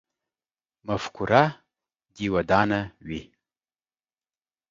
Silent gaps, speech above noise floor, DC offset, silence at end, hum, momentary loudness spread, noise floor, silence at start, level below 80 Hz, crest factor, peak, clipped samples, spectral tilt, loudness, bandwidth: none; over 66 dB; under 0.1%; 1.5 s; none; 16 LU; under -90 dBFS; 0.85 s; -52 dBFS; 26 dB; -2 dBFS; under 0.1%; -6.5 dB/octave; -24 LUFS; 7.6 kHz